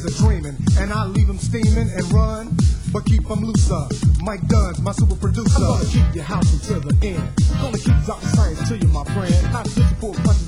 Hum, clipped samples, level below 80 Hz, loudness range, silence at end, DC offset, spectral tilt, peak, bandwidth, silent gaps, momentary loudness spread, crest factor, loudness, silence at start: none; under 0.1%; -20 dBFS; 1 LU; 0 s; under 0.1%; -6.5 dB/octave; -4 dBFS; 11.5 kHz; none; 3 LU; 14 dB; -19 LUFS; 0 s